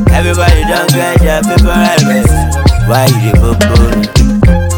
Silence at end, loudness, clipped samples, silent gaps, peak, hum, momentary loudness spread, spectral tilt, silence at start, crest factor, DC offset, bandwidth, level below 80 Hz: 0 s; -9 LUFS; 5%; none; 0 dBFS; none; 2 LU; -5.5 dB/octave; 0 s; 8 dB; under 0.1%; over 20 kHz; -12 dBFS